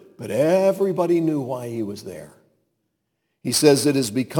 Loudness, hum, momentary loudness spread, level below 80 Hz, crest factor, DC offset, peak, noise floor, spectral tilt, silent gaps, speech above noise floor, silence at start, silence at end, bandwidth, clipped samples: -20 LUFS; none; 16 LU; -66 dBFS; 20 dB; under 0.1%; -2 dBFS; -75 dBFS; -5 dB/octave; none; 55 dB; 0.2 s; 0 s; 19 kHz; under 0.1%